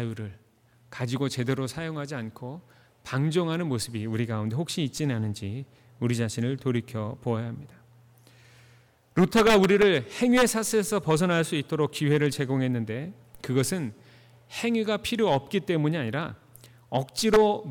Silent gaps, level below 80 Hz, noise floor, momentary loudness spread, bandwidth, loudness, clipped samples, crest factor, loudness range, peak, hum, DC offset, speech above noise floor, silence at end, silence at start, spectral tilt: none; -56 dBFS; -60 dBFS; 16 LU; 19 kHz; -26 LUFS; under 0.1%; 14 dB; 8 LU; -12 dBFS; none; under 0.1%; 35 dB; 0 s; 0 s; -5.5 dB/octave